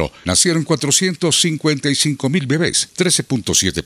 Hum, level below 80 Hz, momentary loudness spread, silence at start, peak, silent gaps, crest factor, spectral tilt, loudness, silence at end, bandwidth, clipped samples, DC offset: none; -46 dBFS; 3 LU; 0 s; 0 dBFS; none; 16 dB; -3 dB/octave; -16 LUFS; 0 s; 16 kHz; under 0.1%; under 0.1%